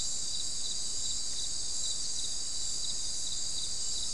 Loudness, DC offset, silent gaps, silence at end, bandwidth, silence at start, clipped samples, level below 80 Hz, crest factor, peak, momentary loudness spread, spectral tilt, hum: -33 LUFS; 2%; none; 0 s; 12 kHz; 0 s; under 0.1%; -52 dBFS; 14 dB; -20 dBFS; 1 LU; 0.5 dB/octave; none